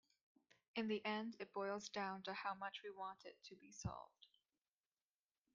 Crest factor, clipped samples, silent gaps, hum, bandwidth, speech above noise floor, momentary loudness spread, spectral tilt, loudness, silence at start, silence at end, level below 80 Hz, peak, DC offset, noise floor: 18 dB; under 0.1%; none; none; 7.4 kHz; over 42 dB; 15 LU; -3.5 dB/octave; -48 LUFS; 0.75 s; 1.3 s; -76 dBFS; -32 dBFS; under 0.1%; under -90 dBFS